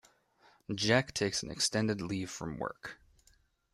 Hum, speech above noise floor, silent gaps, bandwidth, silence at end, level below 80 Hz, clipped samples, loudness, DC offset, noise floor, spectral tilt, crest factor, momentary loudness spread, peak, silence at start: none; 35 dB; none; 15 kHz; 0.8 s; -62 dBFS; under 0.1%; -33 LUFS; under 0.1%; -69 dBFS; -3.5 dB/octave; 22 dB; 16 LU; -14 dBFS; 0.7 s